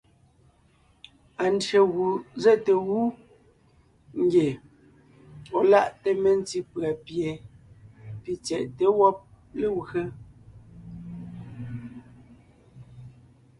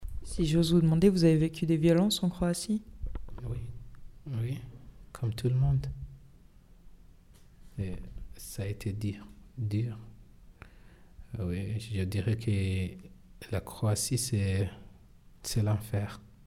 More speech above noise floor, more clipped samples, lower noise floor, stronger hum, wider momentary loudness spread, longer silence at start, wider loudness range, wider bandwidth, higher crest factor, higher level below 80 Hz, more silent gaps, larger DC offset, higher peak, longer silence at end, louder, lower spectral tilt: first, 38 dB vs 27 dB; neither; first, -61 dBFS vs -56 dBFS; neither; about the same, 21 LU vs 21 LU; first, 1.4 s vs 0 s; about the same, 10 LU vs 11 LU; second, 11 kHz vs 15.5 kHz; about the same, 20 dB vs 20 dB; second, -60 dBFS vs -46 dBFS; neither; neither; first, -6 dBFS vs -10 dBFS; first, 0.5 s vs 0.2 s; first, -24 LUFS vs -31 LUFS; about the same, -6 dB/octave vs -6 dB/octave